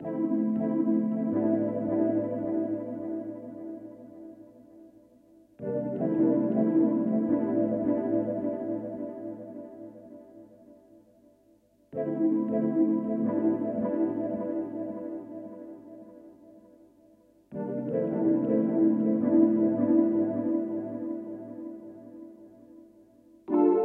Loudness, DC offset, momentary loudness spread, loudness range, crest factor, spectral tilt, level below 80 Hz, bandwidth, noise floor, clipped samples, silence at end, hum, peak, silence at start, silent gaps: -28 LUFS; under 0.1%; 21 LU; 13 LU; 20 dB; -12 dB/octave; -74 dBFS; 2.8 kHz; -63 dBFS; under 0.1%; 0 s; none; -10 dBFS; 0 s; none